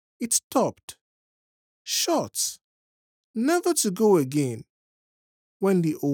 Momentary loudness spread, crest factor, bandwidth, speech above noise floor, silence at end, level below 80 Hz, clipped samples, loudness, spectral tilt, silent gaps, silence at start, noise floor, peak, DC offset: 16 LU; 18 dB; over 20 kHz; over 66 dB; 0 s; -76 dBFS; under 0.1%; -24 LUFS; -4 dB/octave; 0.44-0.50 s, 0.83-0.88 s, 1.01-1.85 s, 2.64-3.34 s, 4.69-5.60 s; 0.2 s; under -90 dBFS; -8 dBFS; under 0.1%